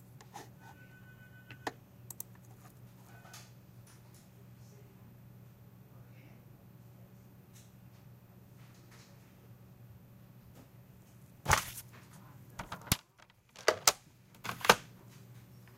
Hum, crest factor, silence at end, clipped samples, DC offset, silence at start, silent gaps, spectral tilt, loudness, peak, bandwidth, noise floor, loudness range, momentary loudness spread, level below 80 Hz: none; 38 dB; 0 s; under 0.1%; under 0.1%; 0 s; none; -2 dB/octave; -33 LUFS; -4 dBFS; 16 kHz; -64 dBFS; 24 LU; 27 LU; -58 dBFS